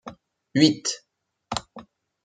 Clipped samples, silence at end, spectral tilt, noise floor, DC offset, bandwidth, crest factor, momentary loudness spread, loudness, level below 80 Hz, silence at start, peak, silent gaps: under 0.1%; 0.45 s; -4 dB/octave; -48 dBFS; under 0.1%; 9.4 kHz; 24 dB; 16 LU; -24 LUFS; -62 dBFS; 0.05 s; -2 dBFS; none